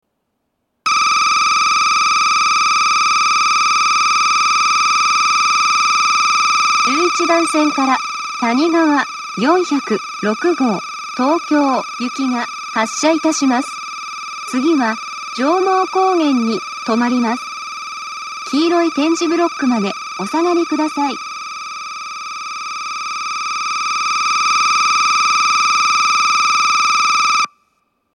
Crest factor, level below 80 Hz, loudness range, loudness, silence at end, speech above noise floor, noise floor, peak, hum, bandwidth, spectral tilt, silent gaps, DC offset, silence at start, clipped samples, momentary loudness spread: 16 dB; -76 dBFS; 6 LU; -14 LUFS; 0.7 s; 55 dB; -70 dBFS; 0 dBFS; 60 Hz at -45 dBFS; 12.5 kHz; -2 dB/octave; none; under 0.1%; 0.85 s; under 0.1%; 12 LU